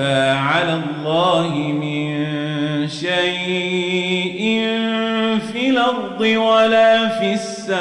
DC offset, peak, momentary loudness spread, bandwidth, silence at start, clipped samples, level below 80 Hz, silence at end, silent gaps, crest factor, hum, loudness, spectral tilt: under 0.1%; -4 dBFS; 8 LU; 11 kHz; 0 s; under 0.1%; -62 dBFS; 0 s; none; 14 dB; none; -18 LUFS; -5 dB/octave